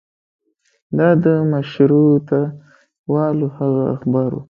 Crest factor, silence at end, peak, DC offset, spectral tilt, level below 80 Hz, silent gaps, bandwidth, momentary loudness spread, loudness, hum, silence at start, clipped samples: 16 dB; 0.05 s; 0 dBFS; under 0.1%; -11 dB/octave; -58 dBFS; 2.99-3.04 s; 5.4 kHz; 8 LU; -17 LUFS; none; 0.9 s; under 0.1%